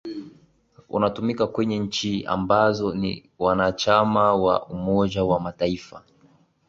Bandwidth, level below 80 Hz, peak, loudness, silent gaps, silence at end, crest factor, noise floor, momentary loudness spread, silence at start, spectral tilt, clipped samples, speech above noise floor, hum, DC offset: 7.8 kHz; -50 dBFS; -4 dBFS; -23 LUFS; none; 0.7 s; 20 dB; -58 dBFS; 9 LU; 0.05 s; -6 dB/octave; under 0.1%; 36 dB; none; under 0.1%